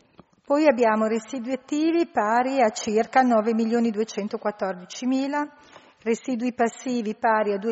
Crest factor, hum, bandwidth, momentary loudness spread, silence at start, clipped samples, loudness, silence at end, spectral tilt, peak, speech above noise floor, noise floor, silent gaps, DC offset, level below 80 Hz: 18 dB; none; 8 kHz; 10 LU; 0.5 s; under 0.1%; -24 LUFS; 0 s; -4 dB/octave; -6 dBFS; 31 dB; -54 dBFS; none; under 0.1%; -70 dBFS